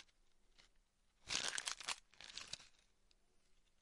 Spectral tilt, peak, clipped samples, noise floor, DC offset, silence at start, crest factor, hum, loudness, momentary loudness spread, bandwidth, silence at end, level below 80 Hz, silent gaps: 1 dB/octave; -18 dBFS; under 0.1%; -76 dBFS; under 0.1%; 0 s; 34 dB; none; -45 LUFS; 13 LU; 12 kHz; 0.3 s; -76 dBFS; none